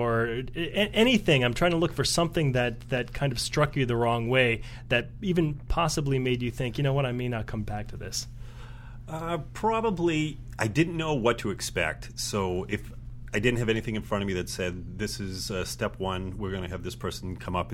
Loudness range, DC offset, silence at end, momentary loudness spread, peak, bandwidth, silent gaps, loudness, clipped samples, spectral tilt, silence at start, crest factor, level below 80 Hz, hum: 6 LU; under 0.1%; 0 s; 11 LU; -6 dBFS; 16.5 kHz; none; -28 LUFS; under 0.1%; -5 dB/octave; 0 s; 20 dB; -42 dBFS; none